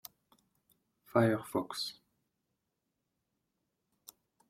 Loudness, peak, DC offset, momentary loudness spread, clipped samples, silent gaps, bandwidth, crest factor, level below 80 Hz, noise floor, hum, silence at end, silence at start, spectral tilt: -34 LUFS; -12 dBFS; under 0.1%; 11 LU; under 0.1%; none; 16.5 kHz; 26 dB; -76 dBFS; -85 dBFS; none; 2.55 s; 1.15 s; -5.5 dB/octave